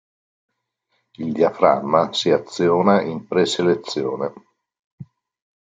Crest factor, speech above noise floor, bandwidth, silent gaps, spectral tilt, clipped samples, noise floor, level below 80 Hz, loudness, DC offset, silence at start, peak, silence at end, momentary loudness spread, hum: 20 dB; 53 dB; 9.4 kHz; 4.79-4.98 s; -5.5 dB/octave; under 0.1%; -72 dBFS; -64 dBFS; -19 LUFS; under 0.1%; 1.2 s; -2 dBFS; 0.65 s; 11 LU; none